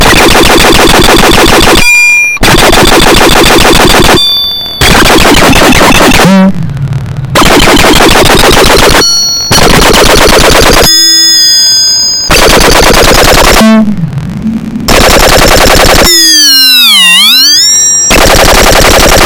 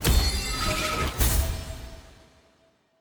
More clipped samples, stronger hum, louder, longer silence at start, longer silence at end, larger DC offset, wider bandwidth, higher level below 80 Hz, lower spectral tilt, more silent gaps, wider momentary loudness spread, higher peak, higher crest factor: first, 20% vs under 0.1%; neither; first, -1 LUFS vs -26 LUFS; about the same, 0 s vs 0 s; second, 0 s vs 0.9 s; first, 5% vs under 0.1%; about the same, over 20 kHz vs over 20 kHz; first, -12 dBFS vs -30 dBFS; about the same, -2.5 dB/octave vs -3.5 dB/octave; neither; second, 7 LU vs 16 LU; first, 0 dBFS vs -8 dBFS; second, 2 dB vs 20 dB